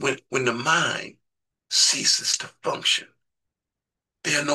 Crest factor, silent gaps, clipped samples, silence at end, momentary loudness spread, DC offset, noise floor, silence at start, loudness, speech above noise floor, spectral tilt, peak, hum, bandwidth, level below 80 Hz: 20 dB; none; under 0.1%; 0 s; 12 LU; under 0.1%; -87 dBFS; 0 s; -22 LUFS; 64 dB; -1 dB/octave; -6 dBFS; none; 12.5 kHz; -72 dBFS